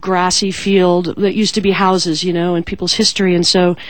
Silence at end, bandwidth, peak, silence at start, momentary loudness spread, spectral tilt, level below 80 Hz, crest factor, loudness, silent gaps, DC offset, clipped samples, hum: 0 s; 17.5 kHz; 0 dBFS; 0.05 s; 5 LU; -4 dB/octave; -44 dBFS; 14 dB; -14 LUFS; none; 2%; under 0.1%; none